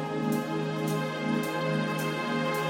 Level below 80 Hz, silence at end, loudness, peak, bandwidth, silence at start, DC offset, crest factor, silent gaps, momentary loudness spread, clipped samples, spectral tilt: -70 dBFS; 0 s; -30 LUFS; -16 dBFS; 17 kHz; 0 s; under 0.1%; 14 dB; none; 1 LU; under 0.1%; -5.5 dB/octave